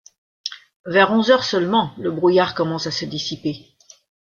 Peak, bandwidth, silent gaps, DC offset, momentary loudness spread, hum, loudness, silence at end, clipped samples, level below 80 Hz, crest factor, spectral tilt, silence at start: -2 dBFS; 7.2 kHz; 0.76-0.84 s; under 0.1%; 16 LU; none; -19 LUFS; 0.8 s; under 0.1%; -60 dBFS; 20 dB; -5 dB/octave; 0.45 s